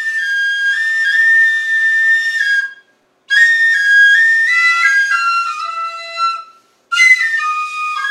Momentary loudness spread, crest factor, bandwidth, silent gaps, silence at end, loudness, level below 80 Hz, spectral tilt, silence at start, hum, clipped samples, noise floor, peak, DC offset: 11 LU; 14 dB; 14 kHz; none; 0 s; -11 LUFS; -88 dBFS; 5 dB/octave; 0 s; none; under 0.1%; -53 dBFS; 0 dBFS; under 0.1%